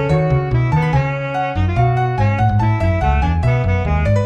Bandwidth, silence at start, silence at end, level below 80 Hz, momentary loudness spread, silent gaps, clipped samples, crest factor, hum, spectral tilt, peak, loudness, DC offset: 8.2 kHz; 0 s; 0 s; -24 dBFS; 3 LU; none; under 0.1%; 12 dB; none; -8.5 dB/octave; -4 dBFS; -17 LUFS; under 0.1%